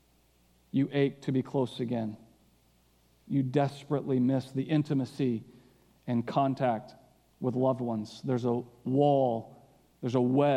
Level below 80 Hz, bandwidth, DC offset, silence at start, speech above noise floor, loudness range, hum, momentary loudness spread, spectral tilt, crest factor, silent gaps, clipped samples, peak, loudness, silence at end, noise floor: -72 dBFS; 11 kHz; under 0.1%; 0.75 s; 37 dB; 3 LU; none; 8 LU; -8.5 dB/octave; 18 dB; none; under 0.1%; -12 dBFS; -30 LUFS; 0 s; -66 dBFS